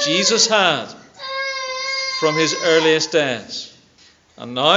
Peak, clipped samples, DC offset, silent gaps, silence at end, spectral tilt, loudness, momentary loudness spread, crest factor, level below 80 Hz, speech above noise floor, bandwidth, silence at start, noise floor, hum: 0 dBFS; under 0.1%; under 0.1%; none; 0 s; -2 dB/octave; -17 LUFS; 17 LU; 18 dB; -68 dBFS; 35 dB; 8 kHz; 0 s; -52 dBFS; none